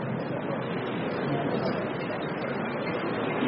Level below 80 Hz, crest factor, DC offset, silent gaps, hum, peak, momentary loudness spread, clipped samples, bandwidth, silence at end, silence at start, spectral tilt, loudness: -62 dBFS; 14 dB; under 0.1%; none; none; -16 dBFS; 3 LU; under 0.1%; 5.4 kHz; 0 s; 0 s; -5 dB/octave; -30 LUFS